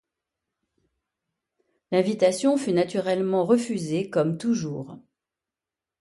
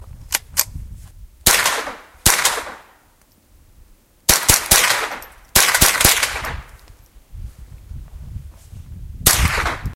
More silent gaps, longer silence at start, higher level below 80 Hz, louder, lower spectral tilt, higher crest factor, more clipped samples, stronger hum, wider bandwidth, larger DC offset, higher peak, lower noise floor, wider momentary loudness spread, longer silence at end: neither; first, 1.9 s vs 0 s; second, -70 dBFS vs -32 dBFS; second, -24 LUFS vs -15 LUFS; first, -6 dB/octave vs -1 dB/octave; about the same, 18 dB vs 20 dB; neither; neither; second, 11.5 kHz vs over 20 kHz; neither; second, -8 dBFS vs 0 dBFS; first, -90 dBFS vs -54 dBFS; second, 6 LU vs 24 LU; first, 1 s vs 0 s